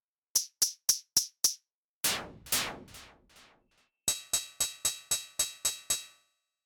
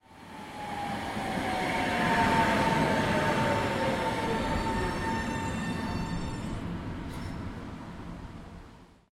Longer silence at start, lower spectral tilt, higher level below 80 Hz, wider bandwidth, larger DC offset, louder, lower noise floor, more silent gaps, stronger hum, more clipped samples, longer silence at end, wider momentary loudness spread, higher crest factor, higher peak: first, 0.35 s vs 0.1 s; second, 1 dB/octave vs -5.5 dB/octave; second, -64 dBFS vs -44 dBFS; first, over 20 kHz vs 16.5 kHz; neither; about the same, -30 LUFS vs -30 LUFS; first, -73 dBFS vs -52 dBFS; first, 1.74-2.01 s vs none; neither; neither; first, 0.6 s vs 0.25 s; second, 11 LU vs 17 LU; first, 24 dB vs 18 dB; about the same, -10 dBFS vs -12 dBFS